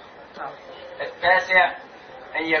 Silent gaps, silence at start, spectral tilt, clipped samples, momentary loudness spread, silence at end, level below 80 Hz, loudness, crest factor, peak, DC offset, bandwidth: none; 0 s; -3.5 dB/octave; under 0.1%; 25 LU; 0 s; -60 dBFS; -20 LUFS; 20 dB; -4 dBFS; under 0.1%; 6.6 kHz